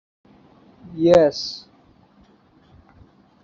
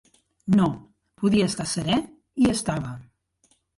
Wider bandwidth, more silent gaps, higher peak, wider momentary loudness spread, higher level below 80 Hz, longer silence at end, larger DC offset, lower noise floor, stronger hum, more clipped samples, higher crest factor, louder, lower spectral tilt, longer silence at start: second, 7.6 kHz vs 11.5 kHz; neither; first, -2 dBFS vs -10 dBFS; first, 23 LU vs 16 LU; about the same, -56 dBFS vs -52 dBFS; first, 1.85 s vs 0.75 s; neither; second, -55 dBFS vs -66 dBFS; neither; neither; first, 22 dB vs 16 dB; first, -18 LUFS vs -24 LUFS; about the same, -6 dB/octave vs -5.5 dB/octave; first, 0.85 s vs 0.45 s